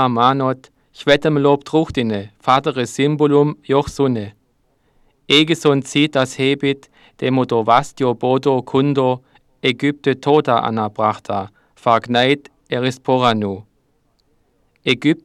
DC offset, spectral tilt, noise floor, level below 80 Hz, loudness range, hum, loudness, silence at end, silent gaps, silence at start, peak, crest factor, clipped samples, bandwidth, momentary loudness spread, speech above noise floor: under 0.1%; -5.5 dB/octave; -62 dBFS; -52 dBFS; 2 LU; none; -17 LUFS; 0.1 s; none; 0 s; 0 dBFS; 16 dB; under 0.1%; 12.5 kHz; 10 LU; 46 dB